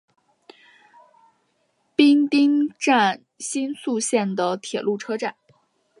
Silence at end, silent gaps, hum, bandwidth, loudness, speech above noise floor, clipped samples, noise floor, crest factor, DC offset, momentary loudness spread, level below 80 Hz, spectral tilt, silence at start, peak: 0.7 s; none; none; 11.5 kHz; -21 LUFS; 47 dB; under 0.1%; -68 dBFS; 20 dB; under 0.1%; 11 LU; -78 dBFS; -4 dB/octave; 2 s; -2 dBFS